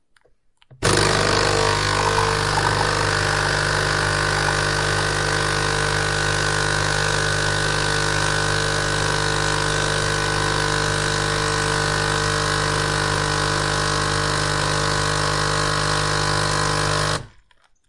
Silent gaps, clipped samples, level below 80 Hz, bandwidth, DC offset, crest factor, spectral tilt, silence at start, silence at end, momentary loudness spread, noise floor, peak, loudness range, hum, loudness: none; under 0.1%; -34 dBFS; 11.5 kHz; under 0.1%; 16 dB; -3 dB/octave; 0.7 s; 0.6 s; 2 LU; -58 dBFS; -4 dBFS; 1 LU; 50 Hz at -25 dBFS; -20 LUFS